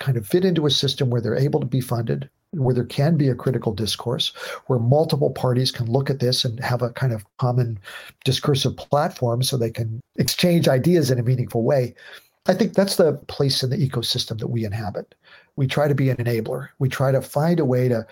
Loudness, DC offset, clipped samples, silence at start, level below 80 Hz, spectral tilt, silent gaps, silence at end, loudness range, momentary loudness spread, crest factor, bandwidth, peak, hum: -21 LUFS; under 0.1%; under 0.1%; 0 s; -58 dBFS; -6 dB/octave; none; 0.05 s; 3 LU; 8 LU; 20 dB; 17 kHz; -2 dBFS; none